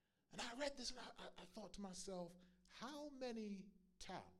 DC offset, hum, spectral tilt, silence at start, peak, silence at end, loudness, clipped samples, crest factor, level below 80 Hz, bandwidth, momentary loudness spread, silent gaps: under 0.1%; none; -3.5 dB/octave; 0.3 s; -32 dBFS; 0 s; -53 LUFS; under 0.1%; 20 dB; -72 dBFS; 15 kHz; 12 LU; none